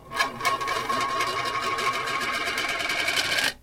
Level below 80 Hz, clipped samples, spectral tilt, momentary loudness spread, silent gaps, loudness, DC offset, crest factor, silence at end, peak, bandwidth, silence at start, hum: -54 dBFS; under 0.1%; -1 dB/octave; 4 LU; none; -25 LUFS; under 0.1%; 18 dB; 0.05 s; -8 dBFS; 17 kHz; 0 s; none